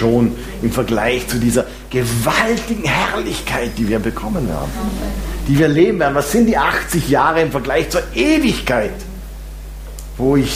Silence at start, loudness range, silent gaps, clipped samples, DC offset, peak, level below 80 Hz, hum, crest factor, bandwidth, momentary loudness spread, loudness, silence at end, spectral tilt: 0 s; 3 LU; none; under 0.1%; under 0.1%; 0 dBFS; -30 dBFS; none; 16 dB; 15.5 kHz; 11 LU; -17 LUFS; 0 s; -5 dB/octave